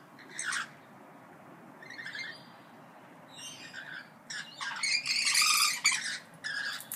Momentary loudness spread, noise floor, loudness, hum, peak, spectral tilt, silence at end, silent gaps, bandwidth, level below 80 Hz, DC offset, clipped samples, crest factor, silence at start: 21 LU; -53 dBFS; -29 LUFS; none; -12 dBFS; 1.5 dB/octave; 0 s; none; 16 kHz; under -90 dBFS; under 0.1%; under 0.1%; 22 dB; 0 s